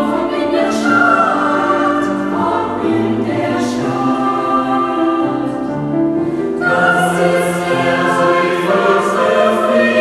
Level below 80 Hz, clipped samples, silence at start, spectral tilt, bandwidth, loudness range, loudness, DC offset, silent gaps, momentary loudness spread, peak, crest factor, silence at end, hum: -50 dBFS; under 0.1%; 0 s; -5.5 dB/octave; 14 kHz; 3 LU; -14 LUFS; under 0.1%; none; 5 LU; 0 dBFS; 14 dB; 0 s; none